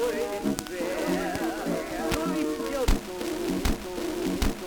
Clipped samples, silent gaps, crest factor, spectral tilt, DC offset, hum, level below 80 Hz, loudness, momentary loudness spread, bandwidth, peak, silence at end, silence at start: under 0.1%; none; 22 dB; -5 dB/octave; under 0.1%; none; -36 dBFS; -29 LUFS; 3 LU; over 20 kHz; -6 dBFS; 0 s; 0 s